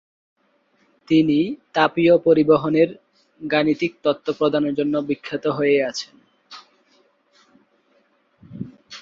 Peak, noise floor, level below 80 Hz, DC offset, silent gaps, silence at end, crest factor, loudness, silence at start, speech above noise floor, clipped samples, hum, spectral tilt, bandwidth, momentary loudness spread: -2 dBFS; -63 dBFS; -62 dBFS; under 0.1%; none; 0 s; 20 dB; -19 LUFS; 1.1 s; 44 dB; under 0.1%; none; -6.5 dB/octave; 7.6 kHz; 18 LU